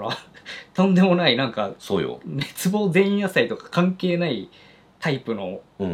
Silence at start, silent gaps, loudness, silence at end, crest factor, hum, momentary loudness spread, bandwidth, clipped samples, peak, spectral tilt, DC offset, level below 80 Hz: 0 s; none; -22 LUFS; 0 s; 18 dB; none; 14 LU; 15.5 kHz; under 0.1%; -4 dBFS; -6 dB/octave; under 0.1%; -64 dBFS